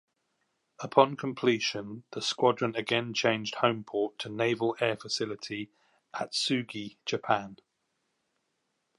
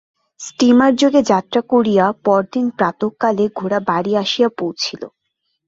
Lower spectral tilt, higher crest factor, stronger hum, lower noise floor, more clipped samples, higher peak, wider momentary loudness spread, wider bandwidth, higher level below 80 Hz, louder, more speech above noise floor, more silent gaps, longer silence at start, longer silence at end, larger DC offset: about the same, -4 dB/octave vs -5 dB/octave; first, 24 dB vs 14 dB; neither; first, -79 dBFS vs -72 dBFS; neither; second, -6 dBFS vs -2 dBFS; about the same, 12 LU vs 11 LU; first, 11.5 kHz vs 7.8 kHz; second, -76 dBFS vs -58 dBFS; second, -30 LUFS vs -16 LUFS; second, 49 dB vs 56 dB; neither; first, 0.8 s vs 0.4 s; first, 1.45 s vs 0.6 s; neither